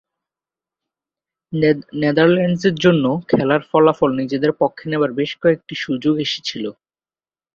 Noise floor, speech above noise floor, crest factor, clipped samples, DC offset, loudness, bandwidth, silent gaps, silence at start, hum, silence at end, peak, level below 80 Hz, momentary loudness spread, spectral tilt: under -90 dBFS; over 73 dB; 16 dB; under 0.1%; under 0.1%; -18 LUFS; 7.4 kHz; none; 1.5 s; none; 0.85 s; -2 dBFS; -56 dBFS; 9 LU; -6.5 dB/octave